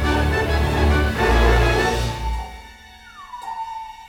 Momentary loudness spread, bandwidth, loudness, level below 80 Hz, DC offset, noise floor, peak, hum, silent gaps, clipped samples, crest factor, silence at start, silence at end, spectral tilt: 19 LU; 17 kHz; -20 LUFS; -24 dBFS; under 0.1%; -43 dBFS; -4 dBFS; none; none; under 0.1%; 16 dB; 0 s; 0 s; -5.5 dB/octave